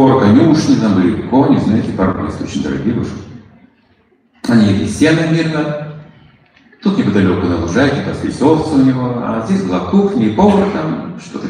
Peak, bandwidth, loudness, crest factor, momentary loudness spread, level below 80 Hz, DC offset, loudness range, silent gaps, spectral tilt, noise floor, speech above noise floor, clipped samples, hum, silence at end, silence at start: 0 dBFS; 10.5 kHz; -13 LUFS; 14 dB; 10 LU; -40 dBFS; under 0.1%; 4 LU; none; -7 dB/octave; -54 dBFS; 41 dB; under 0.1%; none; 0 s; 0 s